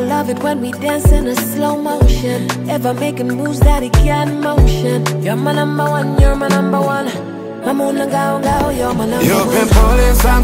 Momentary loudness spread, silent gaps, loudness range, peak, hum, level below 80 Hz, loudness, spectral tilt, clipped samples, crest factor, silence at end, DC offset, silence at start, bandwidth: 7 LU; none; 2 LU; 0 dBFS; none; -18 dBFS; -15 LUFS; -6 dB/octave; under 0.1%; 12 dB; 0 s; under 0.1%; 0 s; 16.5 kHz